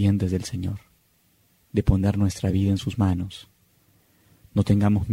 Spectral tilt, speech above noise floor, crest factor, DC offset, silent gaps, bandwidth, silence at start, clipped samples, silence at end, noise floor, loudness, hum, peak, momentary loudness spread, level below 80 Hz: -7.5 dB/octave; 41 dB; 18 dB; under 0.1%; none; 13 kHz; 0 s; under 0.1%; 0 s; -63 dBFS; -24 LUFS; none; -6 dBFS; 11 LU; -38 dBFS